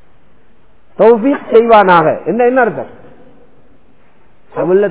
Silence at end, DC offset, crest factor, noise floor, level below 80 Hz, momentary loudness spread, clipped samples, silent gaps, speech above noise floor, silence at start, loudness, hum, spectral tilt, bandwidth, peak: 0 s; 1%; 12 dB; -50 dBFS; -50 dBFS; 16 LU; 1%; none; 41 dB; 1 s; -10 LUFS; none; -10 dB/octave; 4 kHz; 0 dBFS